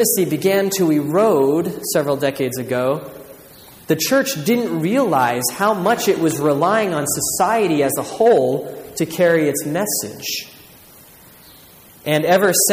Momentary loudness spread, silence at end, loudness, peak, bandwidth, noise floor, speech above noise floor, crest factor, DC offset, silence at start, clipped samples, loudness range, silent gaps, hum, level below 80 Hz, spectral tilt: 9 LU; 0 s; -18 LUFS; -2 dBFS; 15.5 kHz; -45 dBFS; 28 dB; 16 dB; under 0.1%; 0 s; under 0.1%; 4 LU; none; none; -58 dBFS; -4 dB/octave